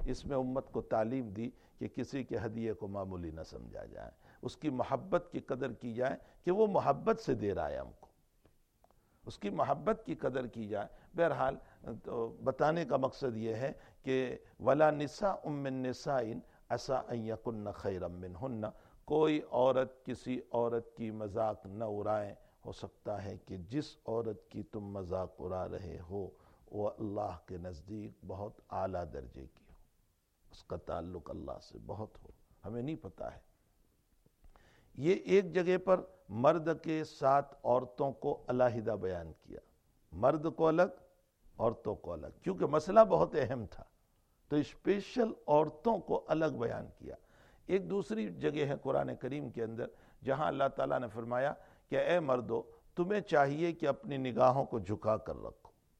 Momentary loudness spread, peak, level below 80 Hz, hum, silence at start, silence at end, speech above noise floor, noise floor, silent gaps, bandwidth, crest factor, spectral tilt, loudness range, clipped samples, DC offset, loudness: 16 LU; -10 dBFS; -60 dBFS; none; 0 s; 0.3 s; 39 dB; -74 dBFS; none; 9.8 kHz; 26 dB; -7 dB/octave; 10 LU; under 0.1%; under 0.1%; -35 LUFS